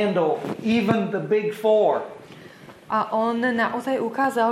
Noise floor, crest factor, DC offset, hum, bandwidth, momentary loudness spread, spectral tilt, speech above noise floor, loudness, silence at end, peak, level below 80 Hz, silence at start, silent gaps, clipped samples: -45 dBFS; 18 dB; under 0.1%; none; 15 kHz; 7 LU; -6.5 dB/octave; 23 dB; -22 LUFS; 0 s; -4 dBFS; -66 dBFS; 0 s; none; under 0.1%